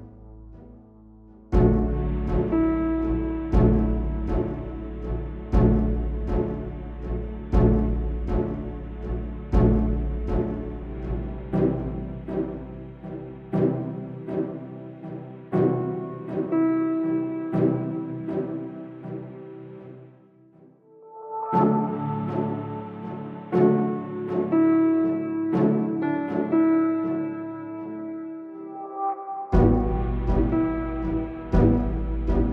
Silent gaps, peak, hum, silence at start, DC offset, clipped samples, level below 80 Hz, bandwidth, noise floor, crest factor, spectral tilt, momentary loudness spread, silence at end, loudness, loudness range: none; -6 dBFS; none; 0 s; under 0.1%; under 0.1%; -30 dBFS; 4.2 kHz; -53 dBFS; 18 dB; -11 dB/octave; 16 LU; 0 s; -25 LUFS; 7 LU